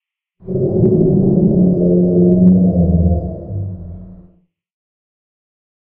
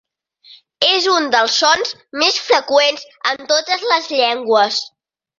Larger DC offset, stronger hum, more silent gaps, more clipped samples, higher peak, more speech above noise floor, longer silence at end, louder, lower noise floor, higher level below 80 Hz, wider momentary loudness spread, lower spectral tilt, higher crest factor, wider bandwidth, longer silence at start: neither; neither; neither; neither; about the same, 0 dBFS vs 0 dBFS; first, 40 dB vs 32 dB; first, 1.85 s vs 0.5 s; about the same, -13 LUFS vs -15 LUFS; first, -52 dBFS vs -48 dBFS; first, -30 dBFS vs -64 dBFS; first, 15 LU vs 8 LU; first, -16 dB/octave vs -0.5 dB/octave; about the same, 14 dB vs 16 dB; second, 1.2 kHz vs 7.6 kHz; about the same, 0.45 s vs 0.5 s